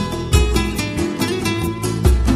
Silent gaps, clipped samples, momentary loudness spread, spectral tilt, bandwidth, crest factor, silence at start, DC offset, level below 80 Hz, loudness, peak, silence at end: none; under 0.1%; 5 LU; -5.5 dB/octave; 15.5 kHz; 18 dB; 0 s; under 0.1%; -20 dBFS; -19 LUFS; 0 dBFS; 0 s